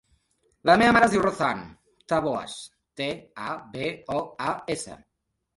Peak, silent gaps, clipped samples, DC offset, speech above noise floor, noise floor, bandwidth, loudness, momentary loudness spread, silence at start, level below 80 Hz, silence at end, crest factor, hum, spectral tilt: -4 dBFS; none; under 0.1%; under 0.1%; 54 dB; -79 dBFS; 11.5 kHz; -25 LUFS; 17 LU; 0.65 s; -56 dBFS; 0.6 s; 22 dB; none; -4.5 dB/octave